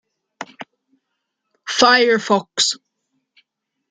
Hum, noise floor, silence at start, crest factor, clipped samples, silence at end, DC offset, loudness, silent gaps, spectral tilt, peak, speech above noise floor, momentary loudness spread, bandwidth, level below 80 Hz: none; -76 dBFS; 0.4 s; 20 dB; under 0.1%; 1.15 s; under 0.1%; -15 LUFS; none; -2 dB/octave; 0 dBFS; 60 dB; 23 LU; 9.6 kHz; -68 dBFS